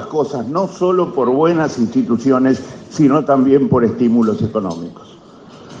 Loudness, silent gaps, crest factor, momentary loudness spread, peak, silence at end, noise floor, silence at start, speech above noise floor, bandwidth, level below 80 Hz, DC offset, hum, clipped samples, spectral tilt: -15 LUFS; none; 14 dB; 9 LU; 0 dBFS; 0 s; -39 dBFS; 0 s; 24 dB; 7.6 kHz; -56 dBFS; under 0.1%; none; under 0.1%; -7.5 dB/octave